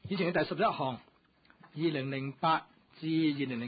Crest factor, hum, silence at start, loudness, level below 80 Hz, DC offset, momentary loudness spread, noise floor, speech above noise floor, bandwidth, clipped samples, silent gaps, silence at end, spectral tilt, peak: 16 dB; none; 0.05 s; -32 LUFS; -68 dBFS; under 0.1%; 8 LU; -66 dBFS; 34 dB; 4.9 kHz; under 0.1%; none; 0 s; -4.5 dB/octave; -18 dBFS